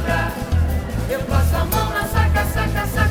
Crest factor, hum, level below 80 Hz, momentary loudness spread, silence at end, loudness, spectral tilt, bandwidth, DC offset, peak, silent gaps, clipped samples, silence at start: 14 dB; none; -26 dBFS; 4 LU; 0 s; -20 LUFS; -5.5 dB/octave; 18 kHz; under 0.1%; -4 dBFS; none; under 0.1%; 0 s